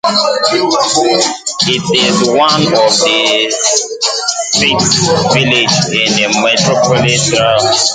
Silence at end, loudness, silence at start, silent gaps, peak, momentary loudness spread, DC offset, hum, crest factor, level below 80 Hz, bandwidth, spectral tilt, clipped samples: 0 s; -10 LUFS; 0.05 s; none; 0 dBFS; 3 LU; under 0.1%; none; 12 dB; -46 dBFS; 11 kHz; -2.5 dB/octave; under 0.1%